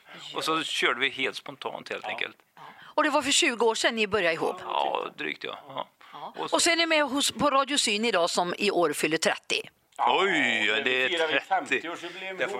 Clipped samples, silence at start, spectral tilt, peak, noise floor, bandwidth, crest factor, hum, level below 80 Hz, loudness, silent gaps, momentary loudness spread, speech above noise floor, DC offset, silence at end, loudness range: under 0.1%; 0.1 s; -1.5 dB/octave; -8 dBFS; -49 dBFS; 16 kHz; 20 dB; none; -68 dBFS; -25 LUFS; none; 14 LU; 22 dB; under 0.1%; 0 s; 3 LU